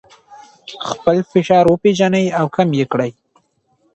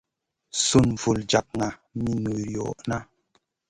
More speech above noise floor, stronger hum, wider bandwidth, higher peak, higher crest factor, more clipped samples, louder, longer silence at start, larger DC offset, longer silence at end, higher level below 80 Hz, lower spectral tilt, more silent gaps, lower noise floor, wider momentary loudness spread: about the same, 46 dB vs 46 dB; neither; second, 8.4 kHz vs 11.5 kHz; first, 0 dBFS vs -4 dBFS; second, 16 dB vs 22 dB; neither; first, -15 LUFS vs -25 LUFS; second, 0.3 s vs 0.55 s; neither; first, 0.85 s vs 0.65 s; second, -54 dBFS vs -48 dBFS; first, -6.5 dB/octave vs -4.5 dB/octave; neither; second, -61 dBFS vs -71 dBFS; first, 14 LU vs 11 LU